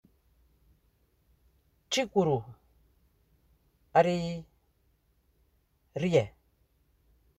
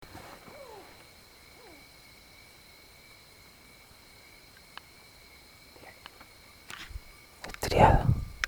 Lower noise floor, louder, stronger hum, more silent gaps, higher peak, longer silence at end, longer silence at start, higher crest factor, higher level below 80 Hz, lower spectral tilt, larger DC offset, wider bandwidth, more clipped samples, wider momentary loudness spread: first, -71 dBFS vs -55 dBFS; second, -29 LUFS vs -26 LUFS; neither; neither; second, -10 dBFS vs -6 dBFS; first, 1.1 s vs 0 s; first, 1.9 s vs 0.15 s; about the same, 24 dB vs 28 dB; second, -64 dBFS vs -42 dBFS; about the same, -5.5 dB/octave vs -5.5 dB/octave; neither; second, 14 kHz vs over 20 kHz; neither; second, 16 LU vs 25 LU